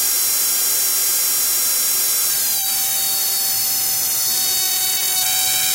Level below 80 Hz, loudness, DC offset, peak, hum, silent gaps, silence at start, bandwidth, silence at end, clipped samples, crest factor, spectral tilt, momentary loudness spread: -60 dBFS; -15 LUFS; under 0.1%; -6 dBFS; none; none; 0 s; 16.5 kHz; 0 s; under 0.1%; 12 dB; 2 dB/octave; 1 LU